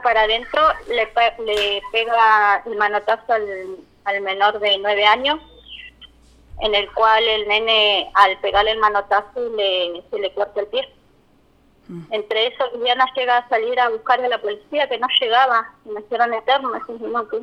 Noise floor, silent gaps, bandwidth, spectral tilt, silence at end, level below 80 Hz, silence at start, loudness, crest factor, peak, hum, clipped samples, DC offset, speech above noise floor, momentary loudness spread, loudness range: -55 dBFS; none; 13 kHz; -3 dB/octave; 0 s; -48 dBFS; 0 s; -18 LUFS; 20 dB; 0 dBFS; none; under 0.1%; under 0.1%; 37 dB; 12 LU; 6 LU